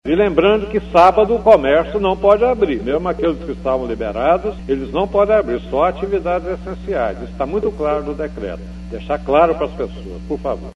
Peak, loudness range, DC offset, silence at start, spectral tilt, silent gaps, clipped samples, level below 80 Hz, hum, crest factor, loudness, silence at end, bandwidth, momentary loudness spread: 0 dBFS; 6 LU; under 0.1%; 0.05 s; -7.5 dB/octave; none; under 0.1%; -34 dBFS; 60 Hz at -30 dBFS; 16 dB; -17 LUFS; 0.05 s; 9 kHz; 14 LU